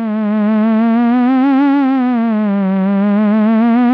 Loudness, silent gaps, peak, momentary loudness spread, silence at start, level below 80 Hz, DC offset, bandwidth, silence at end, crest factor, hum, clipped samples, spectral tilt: -13 LUFS; none; -8 dBFS; 3 LU; 0 s; -72 dBFS; under 0.1%; 4.8 kHz; 0 s; 4 dB; none; under 0.1%; -10.5 dB/octave